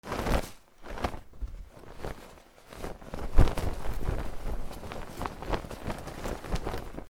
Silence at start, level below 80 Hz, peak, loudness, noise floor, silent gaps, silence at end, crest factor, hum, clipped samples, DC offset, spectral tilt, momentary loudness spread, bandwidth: 0.05 s; -34 dBFS; -4 dBFS; -36 LUFS; -51 dBFS; none; 0 s; 26 dB; none; under 0.1%; under 0.1%; -6 dB/octave; 17 LU; 16 kHz